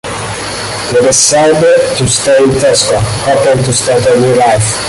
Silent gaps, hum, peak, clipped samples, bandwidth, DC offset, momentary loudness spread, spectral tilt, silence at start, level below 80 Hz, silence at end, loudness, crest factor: none; none; 0 dBFS; under 0.1%; 12 kHz; under 0.1%; 10 LU; -3.5 dB/octave; 0.05 s; -34 dBFS; 0 s; -9 LUFS; 8 dB